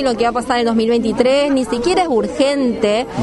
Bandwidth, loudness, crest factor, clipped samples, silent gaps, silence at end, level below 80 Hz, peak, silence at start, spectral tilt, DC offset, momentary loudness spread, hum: 11.5 kHz; -16 LUFS; 16 dB; under 0.1%; none; 0 s; -42 dBFS; 0 dBFS; 0 s; -5 dB/octave; under 0.1%; 3 LU; none